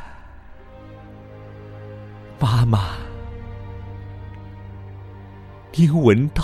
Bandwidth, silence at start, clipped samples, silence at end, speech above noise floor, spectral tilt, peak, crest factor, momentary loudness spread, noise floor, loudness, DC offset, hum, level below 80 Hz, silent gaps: 12.5 kHz; 0 s; under 0.1%; 0 s; 24 dB; -8 dB/octave; -2 dBFS; 22 dB; 25 LU; -41 dBFS; -19 LUFS; under 0.1%; none; -38 dBFS; none